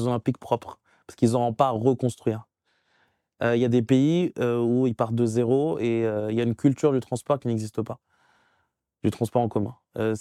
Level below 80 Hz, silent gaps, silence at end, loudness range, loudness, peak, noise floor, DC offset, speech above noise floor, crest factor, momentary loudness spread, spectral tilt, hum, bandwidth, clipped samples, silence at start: -64 dBFS; none; 0 s; 4 LU; -25 LUFS; -6 dBFS; -73 dBFS; under 0.1%; 49 dB; 20 dB; 8 LU; -7.5 dB/octave; none; 13.5 kHz; under 0.1%; 0 s